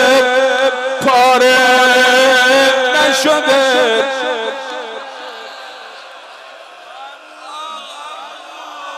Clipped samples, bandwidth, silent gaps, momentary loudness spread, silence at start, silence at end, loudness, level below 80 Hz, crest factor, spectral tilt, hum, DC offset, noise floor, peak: under 0.1%; 16 kHz; none; 23 LU; 0 s; 0 s; -11 LUFS; -64 dBFS; 12 dB; -1 dB/octave; none; under 0.1%; -35 dBFS; -2 dBFS